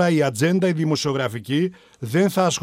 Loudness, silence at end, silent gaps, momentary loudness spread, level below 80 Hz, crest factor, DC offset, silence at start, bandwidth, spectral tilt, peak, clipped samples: -21 LUFS; 0 s; none; 6 LU; -64 dBFS; 14 dB; under 0.1%; 0 s; 16 kHz; -5.5 dB/octave; -6 dBFS; under 0.1%